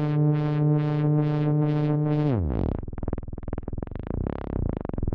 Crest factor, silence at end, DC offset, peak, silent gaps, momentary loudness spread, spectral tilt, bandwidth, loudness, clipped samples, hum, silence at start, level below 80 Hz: 12 dB; 0 s; under 0.1%; -12 dBFS; none; 12 LU; -11 dB/octave; 4.6 kHz; -26 LUFS; under 0.1%; none; 0 s; -36 dBFS